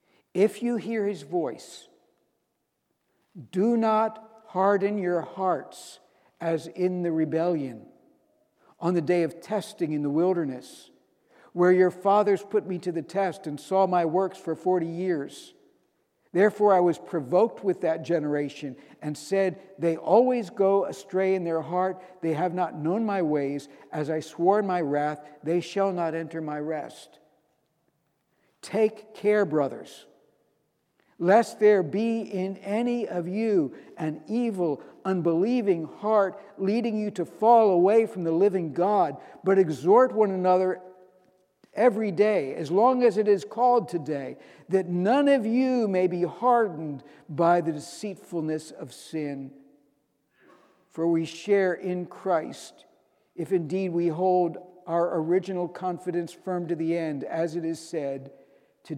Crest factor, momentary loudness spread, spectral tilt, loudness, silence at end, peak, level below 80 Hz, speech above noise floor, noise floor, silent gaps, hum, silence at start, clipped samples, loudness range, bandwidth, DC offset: 20 dB; 13 LU; -7 dB/octave; -26 LUFS; 0 s; -6 dBFS; -82 dBFS; 52 dB; -77 dBFS; none; none; 0.35 s; under 0.1%; 7 LU; 13 kHz; under 0.1%